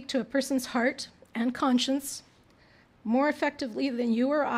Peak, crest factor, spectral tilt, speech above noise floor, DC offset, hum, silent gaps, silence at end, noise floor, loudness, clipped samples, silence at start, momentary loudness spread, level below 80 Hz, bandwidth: -14 dBFS; 14 dB; -3.5 dB/octave; 32 dB; under 0.1%; none; none; 0 s; -59 dBFS; -28 LUFS; under 0.1%; 0 s; 12 LU; -68 dBFS; 16 kHz